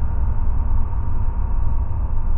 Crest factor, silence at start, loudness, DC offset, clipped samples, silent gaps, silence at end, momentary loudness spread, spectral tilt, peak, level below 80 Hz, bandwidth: 10 dB; 0 s; -25 LUFS; under 0.1%; under 0.1%; none; 0 s; 2 LU; -12.5 dB/octave; -6 dBFS; -18 dBFS; 1.8 kHz